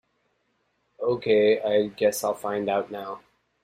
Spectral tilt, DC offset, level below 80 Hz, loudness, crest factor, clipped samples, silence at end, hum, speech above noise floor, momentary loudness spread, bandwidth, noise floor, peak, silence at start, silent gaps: -4.5 dB/octave; under 0.1%; -66 dBFS; -24 LUFS; 16 dB; under 0.1%; 0.45 s; none; 48 dB; 15 LU; 15.5 kHz; -72 dBFS; -10 dBFS; 1 s; none